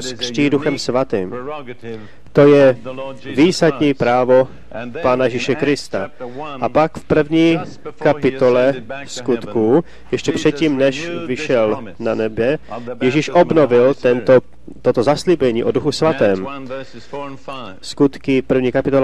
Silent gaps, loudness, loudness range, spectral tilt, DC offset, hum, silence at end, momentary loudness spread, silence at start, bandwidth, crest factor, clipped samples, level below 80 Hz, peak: none; -16 LUFS; 4 LU; -6 dB/octave; 2%; none; 0 s; 16 LU; 0 s; 11.5 kHz; 16 dB; under 0.1%; -48 dBFS; 0 dBFS